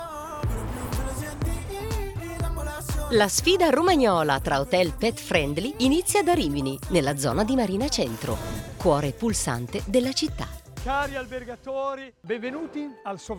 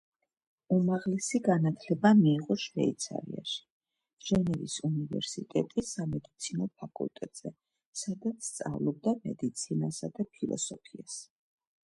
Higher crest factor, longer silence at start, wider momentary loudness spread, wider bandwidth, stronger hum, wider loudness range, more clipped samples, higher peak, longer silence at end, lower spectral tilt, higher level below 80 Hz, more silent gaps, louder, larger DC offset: about the same, 20 dB vs 22 dB; second, 0 s vs 0.7 s; about the same, 13 LU vs 14 LU; first, 20 kHz vs 11.5 kHz; neither; about the same, 7 LU vs 8 LU; neither; first, -4 dBFS vs -10 dBFS; second, 0 s vs 0.65 s; about the same, -4.5 dB/octave vs -5.5 dB/octave; first, -38 dBFS vs -64 dBFS; second, none vs 3.70-3.81 s, 4.13-4.17 s, 7.86-7.93 s; first, -25 LUFS vs -32 LUFS; neither